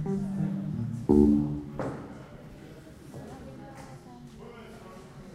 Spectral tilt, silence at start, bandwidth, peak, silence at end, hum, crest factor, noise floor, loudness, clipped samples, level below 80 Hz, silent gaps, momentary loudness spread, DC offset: -9 dB/octave; 0 s; 12 kHz; -8 dBFS; 0 s; none; 22 dB; -47 dBFS; -27 LUFS; under 0.1%; -46 dBFS; none; 24 LU; under 0.1%